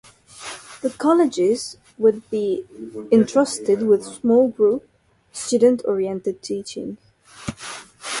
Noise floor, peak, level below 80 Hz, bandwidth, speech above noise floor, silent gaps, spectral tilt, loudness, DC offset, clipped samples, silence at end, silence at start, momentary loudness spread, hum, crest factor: -38 dBFS; -4 dBFS; -58 dBFS; 11.5 kHz; 19 dB; none; -5 dB/octave; -20 LUFS; under 0.1%; under 0.1%; 0 s; 0.35 s; 17 LU; none; 16 dB